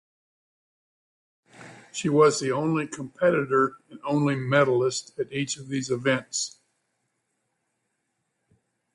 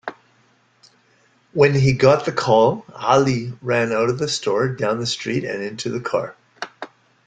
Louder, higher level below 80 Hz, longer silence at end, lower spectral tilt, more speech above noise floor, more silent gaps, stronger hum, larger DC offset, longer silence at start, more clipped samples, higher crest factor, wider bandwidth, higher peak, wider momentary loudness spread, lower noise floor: second, -25 LUFS vs -19 LUFS; second, -68 dBFS vs -54 dBFS; first, 2.45 s vs 0.4 s; about the same, -5 dB/octave vs -5.5 dB/octave; first, 53 dB vs 40 dB; neither; neither; neither; first, 1.6 s vs 0.05 s; neither; about the same, 20 dB vs 18 dB; first, 11.5 kHz vs 9.2 kHz; second, -6 dBFS vs -2 dBFS; second, 11 LU vs 18 LU; first, -77 dBFS vs -59 dBFS